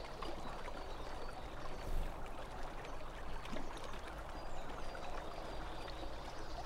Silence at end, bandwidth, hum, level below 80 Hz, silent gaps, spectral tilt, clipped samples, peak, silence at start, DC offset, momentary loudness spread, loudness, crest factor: 0 s; 13.5 kHz; none; -46 dBFS; none; -5 dB/octave; under 0.1%; -28 dBFS; 0 s; under 0.1%; 3 LU; -48 LUFS; 16 dB